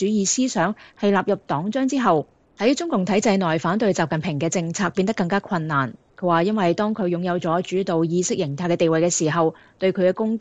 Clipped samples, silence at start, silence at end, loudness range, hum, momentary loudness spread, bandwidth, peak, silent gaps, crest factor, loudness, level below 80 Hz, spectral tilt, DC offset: under 0.1%; 0 s; 0 s; 1 LU; none; 5 LU; 9.2 kHz; -6 dBFS; none; 16 dB; -21 LUFS; -60 dBFS; -5 dB/octave; 0.1%